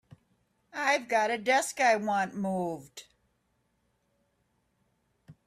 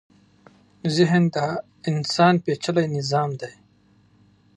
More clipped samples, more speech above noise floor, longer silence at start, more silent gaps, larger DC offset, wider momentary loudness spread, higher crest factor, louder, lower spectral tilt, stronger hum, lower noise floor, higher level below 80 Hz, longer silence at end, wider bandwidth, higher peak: neither; first, 46 dB vs 37 dB; about the same, 0.75 s vs 0.85 s; neither; neither; first, 17 LU vs 11 LU; about the same, 20 dB vs 20 dB; second, -28 LUFS vs -22 LUFS; second, -3.5 dB/octave vs -6 dB/octave; second, none vs 50 Hz at -55 dBFS; first, -75 dBFS vs -58 dBFS; second, -76 dBFS vs -66 dBFS; second, 0.15 s vs 1.05 s; first, 15 kHz vs 10.5 kHz; second, -12 dBFS vs -4 dBFS